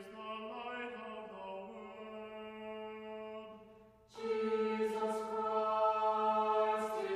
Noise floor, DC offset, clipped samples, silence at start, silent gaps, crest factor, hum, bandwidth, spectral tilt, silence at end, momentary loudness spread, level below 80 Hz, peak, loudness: -61 dBFS; under 0.1%; under 0.1%; 0 s; none; 16 dB; none; 13 kHz; -5 dB/octave; 0 s; 16 LU; -76 dBFS; -22 dBFS; -37 LUFS